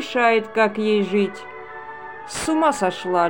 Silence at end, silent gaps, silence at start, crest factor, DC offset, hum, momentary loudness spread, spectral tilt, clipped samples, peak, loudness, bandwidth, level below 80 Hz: 0 s; none; 0 s; 16 dB; 0.4%; none; 17 LU; -4.5 dB/octave; under 0.1%; -4 dBFS; -20 LUFS; 17 kHz; -56 dBFS